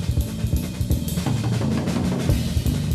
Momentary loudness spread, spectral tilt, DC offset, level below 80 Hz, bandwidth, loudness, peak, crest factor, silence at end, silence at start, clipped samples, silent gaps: 3 LU; -6.5 dB/octave; under 0.1%; -28 dBFS; 14 kHz; -23 LUFS; -8 dBFS; 14 dB; 0 s; 0 s; under 0.1%; none